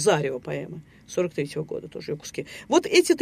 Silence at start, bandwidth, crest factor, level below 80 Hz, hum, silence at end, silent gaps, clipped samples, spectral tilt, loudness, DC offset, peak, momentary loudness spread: 0 s; 15 kHz; 20 dB; -62 dBFS; none; 0 s; none; under 0.1%; -4.5 dB/octave; -26 LUFS; under 0.1%; -4 dBFS; 15 LU